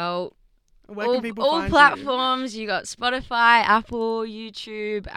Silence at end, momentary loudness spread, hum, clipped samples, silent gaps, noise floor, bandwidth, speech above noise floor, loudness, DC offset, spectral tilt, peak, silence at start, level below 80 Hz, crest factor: 0 s; 16 LU; none; under 0.1%; none; -57 dBFS; 13 kHz; 36 dB; -21 LUFS; under 0.1%; -3.5 dB/octave; -2 dBFS; 0 s; -48 dBFS; 22 dB